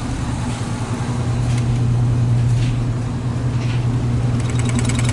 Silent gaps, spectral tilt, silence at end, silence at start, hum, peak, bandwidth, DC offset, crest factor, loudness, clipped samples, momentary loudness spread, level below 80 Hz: none; -6.5 dB/octave; 0 s; 0 s; none; -4 dBFS; 11.5 kHz; under 0.1%; 14 dB; -19 LUFS; under 0.1%; 6 LU; -30 dBFS